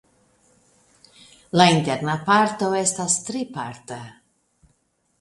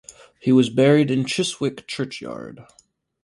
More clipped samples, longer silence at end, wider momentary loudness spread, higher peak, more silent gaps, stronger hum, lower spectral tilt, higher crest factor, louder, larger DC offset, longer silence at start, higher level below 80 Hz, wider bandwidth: neither; first, 1.1 s vs 0.6 s; first, 20 LU vs 17 LU; first, 0 dBFS vs -4 dBFS; neither; neither; second, -3.5 dB/octave vs -5.5 dB/octave; first, 24 dB vs 18 dB; about the same, -20 LUFS vs -20 LUFS; neither; first, 1.55 s vs 0.45 s; about the same, -62 dBFS vs -62 dBFS; about the same, 11.5 kHz vs 11.5 kHz